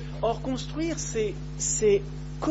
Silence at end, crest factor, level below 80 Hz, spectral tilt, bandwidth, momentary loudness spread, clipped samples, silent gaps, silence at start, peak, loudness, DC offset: 0 s; 16 dB; -40 dBFS; -4.5 dB/octave; 8.2 kHz; 8 LU; under 0.1%; none; 0 s; -12 dBFS; -28 LUFS; under 0.1%